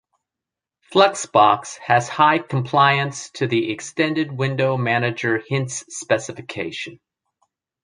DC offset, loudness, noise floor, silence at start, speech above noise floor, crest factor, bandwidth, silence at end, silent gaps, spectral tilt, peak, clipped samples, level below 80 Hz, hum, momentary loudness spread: under 0.1%; -20 LUFS; -87 dBFS; 0.9 s; 67 dB; 20 dB; 10.5 kHz; 0.9 s; none; -4.5 dB/octave; -2 dBFS; under 0.1%; -64 dBFS; none; 12 LU